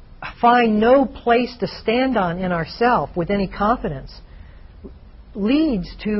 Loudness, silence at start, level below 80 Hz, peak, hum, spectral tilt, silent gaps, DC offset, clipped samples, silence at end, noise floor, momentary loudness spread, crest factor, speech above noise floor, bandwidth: -19 LUFS; 0 s; -40 dBFS; -4 dBFS; none; -4.5 dB/octave; none; under 0.1%; under 0.1%; 0 s; -41 dBFS; 10 LU; 16 dB; 22 dB; 6 kHz